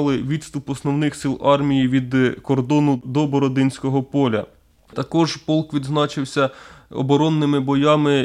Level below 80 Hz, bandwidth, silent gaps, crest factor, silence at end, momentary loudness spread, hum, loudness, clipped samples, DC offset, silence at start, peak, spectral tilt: -52 dBFS; 11 kHz; none; 16 dB; 0 s; 9 LU; none; -20 LUFS; under 0.1%; under 0.1%; 0 s; -2 dBFS; -6.5 dB/octave